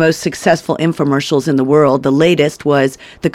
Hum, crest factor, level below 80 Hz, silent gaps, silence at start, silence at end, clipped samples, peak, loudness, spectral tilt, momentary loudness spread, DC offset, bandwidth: none; 12 dB; -50 dBFS; none; 0 s; 0.05 s; under 0.1%; 0 dBFS; -13 LUFS; -6 dB/octave; 5 LU; under 0.1%; 15.5 kHz